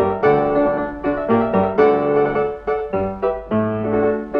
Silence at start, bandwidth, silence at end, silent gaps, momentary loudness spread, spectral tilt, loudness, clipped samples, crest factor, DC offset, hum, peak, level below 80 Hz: 0 s; 5.2 kHz; 0 s; none; 7 LU; -9.5 dB/octave; -18 LUFS; under 0.1%; 16 dB; under 0.1%; none; -2 dBFS; -42 dBFS